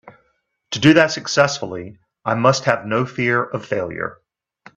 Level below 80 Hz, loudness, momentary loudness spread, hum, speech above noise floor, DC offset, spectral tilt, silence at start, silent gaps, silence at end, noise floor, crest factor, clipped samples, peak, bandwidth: -58 dBFS; -18 LUFS; 15 LU; none; 49 dB; under 0.1%; -5 dB/octave; 0.05 s; none; 0.65 s; -67 dBFS; 20 dB; under 0.1%; 0 dBFS; 8.4 kHz